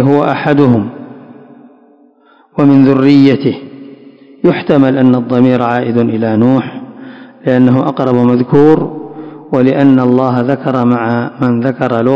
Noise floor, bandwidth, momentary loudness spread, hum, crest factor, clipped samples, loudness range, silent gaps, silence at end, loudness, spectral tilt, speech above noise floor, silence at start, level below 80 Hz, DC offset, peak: -46 dBFS; 5.8 kHz; 16 LU; none; 10 dB; 2%; 2 LU; none; 0 s; -10 LUFS; -9.5 dB/octave; 37 dB; 0 s; -52 dBFS; under 0.1%; 0 dBFS